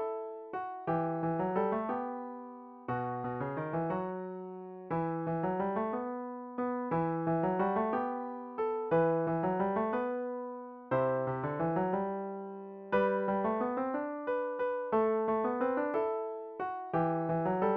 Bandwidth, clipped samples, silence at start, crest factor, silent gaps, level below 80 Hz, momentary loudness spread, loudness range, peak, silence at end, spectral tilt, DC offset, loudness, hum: 5 kHz; under 0.1%; 0 s; 16 dB; none; -68 dBFS; 10 LU; 4 LU; -18 dBFS; 0 s; -7.5 dB/octave; under 0.1%; -34 LUFS; none